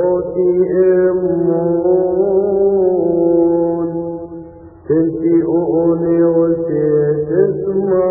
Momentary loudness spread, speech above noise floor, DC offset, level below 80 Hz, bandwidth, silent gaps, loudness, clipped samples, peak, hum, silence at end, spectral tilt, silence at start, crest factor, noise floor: 5 LU; 22 dB; under 0.1%; -46 dBFS; 2.4 kHz; none; -14 LUFS; under 0.1%; -2 dBFS; none; 0 s; -16.5 dB/octave; 0 s; 12 dB; -35 dBFS